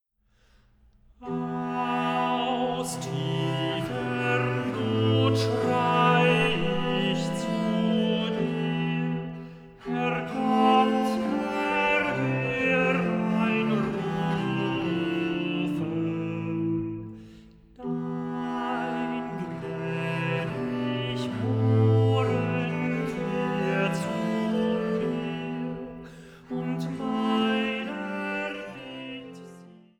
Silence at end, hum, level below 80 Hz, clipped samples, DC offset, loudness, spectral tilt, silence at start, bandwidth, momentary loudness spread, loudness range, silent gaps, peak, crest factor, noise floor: 0.2 s; none; -58 dBFS; under 0.1%; under 0.1%; -27 LUFS; -6.5 dB/octave; 1.2 s; 13.5 kHz; 11 LU; 6 LU; none; -8 dBFS; 18 dB; -65 dBFS